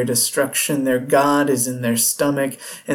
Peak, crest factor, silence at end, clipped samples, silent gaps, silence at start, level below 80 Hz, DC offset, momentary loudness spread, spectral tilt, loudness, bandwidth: -4 dBFS; 14 dB; 0 s; under 0.1%; none; 0 s; -64 dBFS; under 0.1%; 5 LU; -3.5 dB/octave; -18 LUFS; 19 kHz